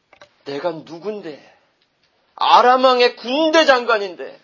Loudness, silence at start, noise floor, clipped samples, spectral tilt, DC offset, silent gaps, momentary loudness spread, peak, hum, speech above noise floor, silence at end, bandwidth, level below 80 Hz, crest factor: -15 LUFS; 0.45 s; -63 dBFS; under 0.1%; -3 dB/octave; under 0.1%; none; 18 LU; 0 dBFS; none; 46 dB; 0.1 s; 7.4 kHz; -68 dBFS; 18 dB